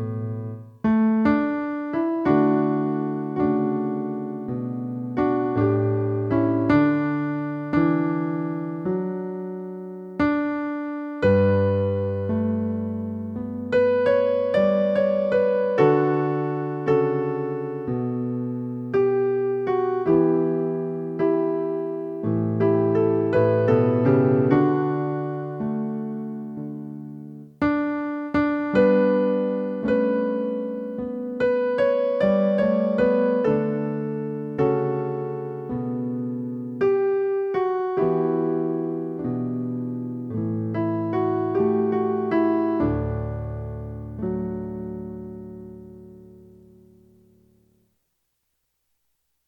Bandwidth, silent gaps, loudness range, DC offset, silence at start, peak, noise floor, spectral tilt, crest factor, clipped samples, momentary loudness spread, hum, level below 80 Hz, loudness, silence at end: 5.8 kHz; none; 6 LU; under 0.1%; 0 s; -4 dBFS; -75 dBFS; -10 dB/octave; 18 dB; under 0.1%; 11 LU; none; -50 dBFS; -23 LUFS; 3.1 s